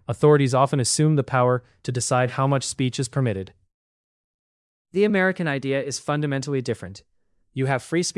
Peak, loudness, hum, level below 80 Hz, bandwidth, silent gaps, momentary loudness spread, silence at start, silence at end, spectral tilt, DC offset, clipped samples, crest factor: -4 dBFS; -22 LUFS; none; -62 dBFS; 12 kHz; 3.74-4.85 s; 12 LU; 0.1 s; 0.05 s; -5 dB/octave; under 0.1%; under 0.1%; 18 dB